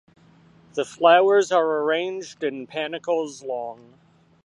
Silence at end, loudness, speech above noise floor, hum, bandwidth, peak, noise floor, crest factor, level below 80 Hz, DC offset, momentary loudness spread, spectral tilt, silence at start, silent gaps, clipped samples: 0.7 s; -22 LUFS; 32 dB; none; 11 kHz; -2 dBFS; -54 dBFS; 20 dB; -74 dBFS; under 0.1%; 15 LU; -3.5 dB/octave; 0.75 s; none; under 0.1%